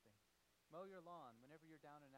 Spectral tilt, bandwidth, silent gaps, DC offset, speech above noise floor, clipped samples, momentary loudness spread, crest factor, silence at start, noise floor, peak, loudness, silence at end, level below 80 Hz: -6 dB/octave; 15.5 kHz; none; under 0.1%; 19 dB; under 0.1%; 7 LU; 18 dB; 0 s; -81 dBFS; -44 dBFS; -61 LUFS; 0 s; under -90 dBFS